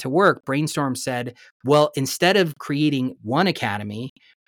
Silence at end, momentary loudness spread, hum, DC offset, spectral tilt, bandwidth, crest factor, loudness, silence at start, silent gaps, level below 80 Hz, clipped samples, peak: 0.4 s; 14 LU; none; under 0.1%; -5 dB/octave; over 20 kHz; 16 dB; -21 LUFS; 0 s; 1.51-1.60 s; -66 dBFS; under 0.1%; -4 dBFS